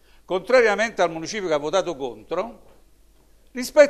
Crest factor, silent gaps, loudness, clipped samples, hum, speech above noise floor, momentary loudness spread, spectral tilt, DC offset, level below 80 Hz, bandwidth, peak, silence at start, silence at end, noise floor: 20 dB; none; -23 LUFS; under 0.1%; 50 Hz at -60 dBFS; 34 dB; 14 LU; -3.5 dB/octave; 0.1%; -54 dBFS; 14 kHz; -2 dBFS; 0.3 s; 0 s; -55 dBFS